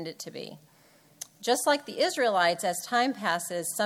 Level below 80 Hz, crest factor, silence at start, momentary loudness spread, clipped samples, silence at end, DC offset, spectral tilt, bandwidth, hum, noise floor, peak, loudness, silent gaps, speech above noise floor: -80 dBFS; 18 dB; 0 s; 17 LU; under 0.1%; 0 s; under 0.1%; -2.5 dB/octave; 17.5 kHz; none; -60 dBFS; -10 dBFS; -27 LUFS; none; 32 dB